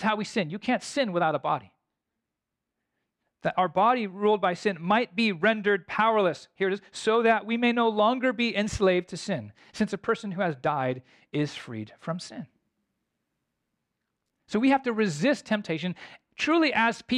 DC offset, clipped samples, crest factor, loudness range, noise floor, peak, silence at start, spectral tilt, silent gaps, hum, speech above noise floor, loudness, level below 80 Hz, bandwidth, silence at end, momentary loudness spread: under 0.1%; under 0.1%; 16 dB; 8 LU; -86 dBFS; -12 dBFS; 0 s; -5 dB/octave; none; none; 59 dB; -26 LUFS; -60 dBFS; 11 kHz; 0 s; 12 LU